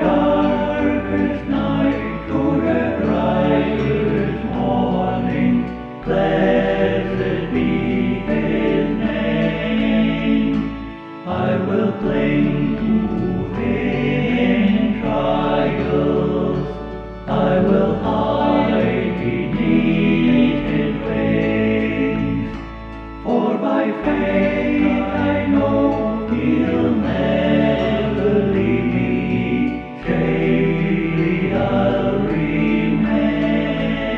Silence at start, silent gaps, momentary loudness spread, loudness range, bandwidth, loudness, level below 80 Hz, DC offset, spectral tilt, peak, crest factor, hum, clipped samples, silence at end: 0 s; none; 5 LU; 2 LU; 6.4 kHz; -18 LUFS; -36 dBFS; under 0.1%; -9 dB/octave; -4 dBFS; 14 dB; none; under 0.1%; 0 s